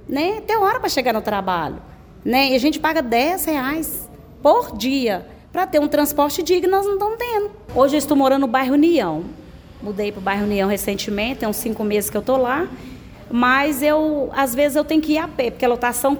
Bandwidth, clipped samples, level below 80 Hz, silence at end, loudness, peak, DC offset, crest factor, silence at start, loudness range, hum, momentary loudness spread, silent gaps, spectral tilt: over 20 kHz; under 0.1%; -46 dBFS; 0 s; -19 LUFS; -2 dBFS; under 0.1%; 16 dB; 0 s; 3 LU; none; 9 LU; none; -4 dB/octave